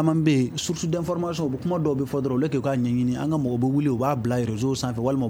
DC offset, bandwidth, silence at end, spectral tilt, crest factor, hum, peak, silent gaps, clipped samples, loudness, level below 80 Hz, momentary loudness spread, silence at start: under 0.1%; over 20 kHz; 0 s; -6.5 dB/octave; 16 dB; none; -8 dBFS; none; under 0.1%; -24 LUFS; -52 dBFS; 4 LU; 0 s